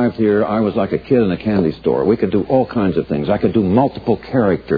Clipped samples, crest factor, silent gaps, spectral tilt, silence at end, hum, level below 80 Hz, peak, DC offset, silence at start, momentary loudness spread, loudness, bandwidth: under 0.1%; 16 dB; none; -10.5 dB/octave; 0 s; none; -44 dBFS; 0 dBFS; under 0.1%; 0 s; 3 LU; -16 LUFS; 5 kHz